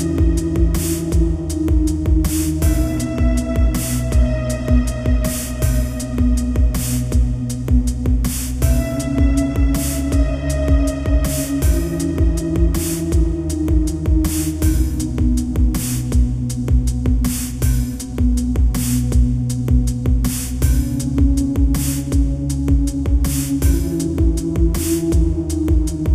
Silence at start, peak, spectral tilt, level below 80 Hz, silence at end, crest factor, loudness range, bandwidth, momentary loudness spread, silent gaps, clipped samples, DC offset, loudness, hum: 0 s; -2 dBFS; -6.5 dB/octave; -18 dBFS; 0 s; 14 dB; 1 LU; 15.5 kHz; 3 LU; none; under 0.1%; under 0.1%; -19 LUFS; none